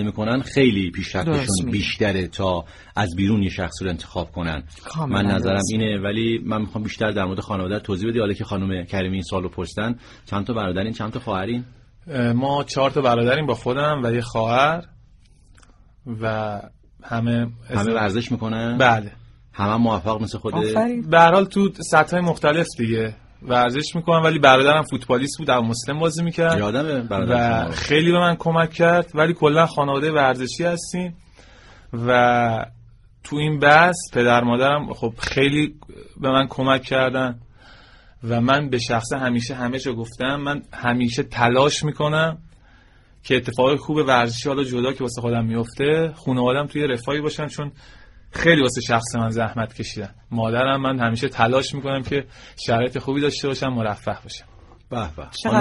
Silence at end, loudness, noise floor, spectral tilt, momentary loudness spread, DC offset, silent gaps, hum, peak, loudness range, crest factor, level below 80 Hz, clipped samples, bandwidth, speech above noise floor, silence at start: 0 s; -20 LUFS; -51 dBFS; -5.5 dB/octave; 11 LU; under 0.1%; none; none; 0 dBFS; 6 LU; 20 dB; -46 dBFS; under 0.1%; 11.5 kHz; 31 dB; 0 s